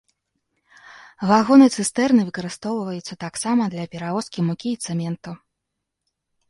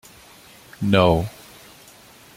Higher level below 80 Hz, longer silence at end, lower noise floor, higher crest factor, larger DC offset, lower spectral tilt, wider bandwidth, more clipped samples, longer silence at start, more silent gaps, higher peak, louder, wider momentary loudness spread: second, -62 dBFS vs -46 dBFS; about the same, 1.15 s vs 1.05 s; first, -80 dBFS vs -48 dBFS; about the same, 20 dB vs 22 dB; neither; about the same, -5.5 dB/octave vs -6.5 dB/octave; second, 11.5 kHz vs 16.5 kHz; neither; first, 0.95 s vs 0.8 s; neither; about the same, -2 dBFS vs -2 dBFS; about the same, -21 LUFS vs -20 LUFS; second, 17 LU vs 26 LU